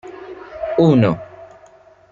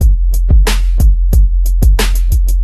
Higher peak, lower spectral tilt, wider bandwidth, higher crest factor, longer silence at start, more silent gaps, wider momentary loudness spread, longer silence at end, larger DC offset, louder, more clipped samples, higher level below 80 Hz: about the same, -2 dBFS vs 0 dBFS; first, -9 dB/octave vs -5 dB/octave; second, 7.4 kHz vs 13.5 kHz; first, 18 dB vs 8 dB; about the same, 0.05 s vs 0 s; neither; first, 22 LU vs 3 LU; first, 0.65 s vs 0 s; neither; second, -16 LUFS vs -13 LUFS; neither; second, -52 dBFS vs -8 dBFS